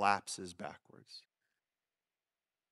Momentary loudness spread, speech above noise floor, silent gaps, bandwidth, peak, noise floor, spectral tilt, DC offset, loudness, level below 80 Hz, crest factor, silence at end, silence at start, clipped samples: 20 LU; over 50 dB; none; 13 kHz; -14 dBFS; under -90 dBFS; -3 dB/octave; under 0.1%; -40 LUFS; -84 dBFS; 28 dB; 1.5 s; 0 s; under 0.1%